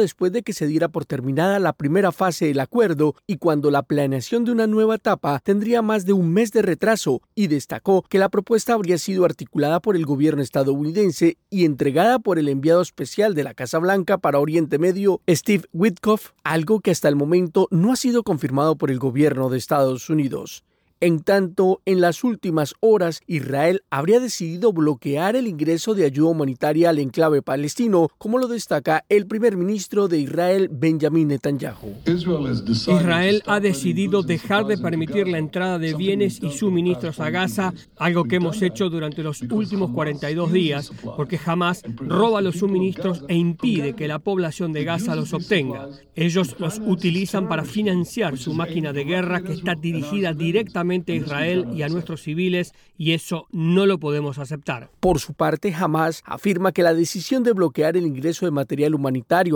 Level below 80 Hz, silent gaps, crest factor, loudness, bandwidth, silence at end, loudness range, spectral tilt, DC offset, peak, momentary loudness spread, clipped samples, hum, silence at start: -54 dBFS; none; 14 dB; -21 LUFS; over 20 kHz; 0 s; 4 LU; -6 dB/octave; under 0.1%; -6 dBFS; 6 LU; under 0.1%; none; 0 s